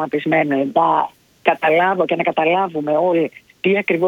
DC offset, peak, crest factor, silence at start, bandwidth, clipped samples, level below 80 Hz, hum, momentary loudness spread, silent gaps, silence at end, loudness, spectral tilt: under 0.1%; 0 dBFS; 16 dB; 0 s; 17 kHz; under 0.1%; -66 dBFS; none; 5 LU; none; 0 s; -17 LUFS; -7.5 dB/octave